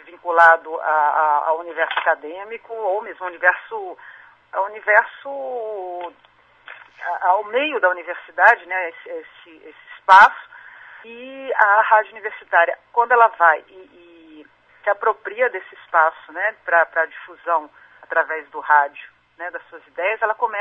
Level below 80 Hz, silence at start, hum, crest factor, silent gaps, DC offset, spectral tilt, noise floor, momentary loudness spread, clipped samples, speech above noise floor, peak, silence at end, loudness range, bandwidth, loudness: -70 dBFS; 0.1 s; none; 20 dB; none; under 0.1%; -2.5 dB/octave; -47 dBFS; 19 LU; under 0.1%; 28 dB; 0 dBFS; 0 s; 6 LU; 8.6 kHz; -18 LUFS